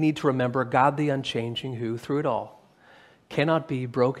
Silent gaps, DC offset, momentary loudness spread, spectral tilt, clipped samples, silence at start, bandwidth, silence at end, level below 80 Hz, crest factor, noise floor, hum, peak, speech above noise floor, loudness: none; under 0.1%; 10 LU; -7 dB/octave; under 0.1%; 0 s; 13 kHz; 0 s; -66 dBFS; 20 dB; -55 dBFS; none; -6 dBFS; 30 dB; -26 LUFS